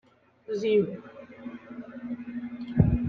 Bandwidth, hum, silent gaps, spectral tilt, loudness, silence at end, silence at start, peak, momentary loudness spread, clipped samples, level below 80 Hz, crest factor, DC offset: 6.8 kHz; none; none; -9 dB/octave; -29 LUFS; 0 s; 0.5 s; -6 dBFS; 18 LU; under 0.1%; -42 dBFS; 24 dB; under 0.1%